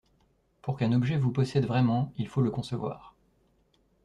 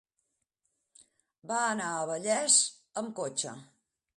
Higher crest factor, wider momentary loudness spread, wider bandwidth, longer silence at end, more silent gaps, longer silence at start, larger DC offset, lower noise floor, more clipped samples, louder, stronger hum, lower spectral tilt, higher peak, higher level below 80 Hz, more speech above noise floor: second, 16 dB vs 22 dB; second, 11 LU vs 15 LU; second, 10 kHz vs 11.5 kHz; first, 0.95 s vs 0.55 s; neither; second, 0.65 s vs 1.45 s; neither; second, -68 dBFS vs -81 dBFS; neither; about the same, -28 LUFS vs -29 LUFS; neither; first, -8 dB/octave vs -1 dB/octave; second, -14 dBFS vs -10 dBFS; first, -60 dBFS vs -82 dBFS; second, 41 dB vs 51 dB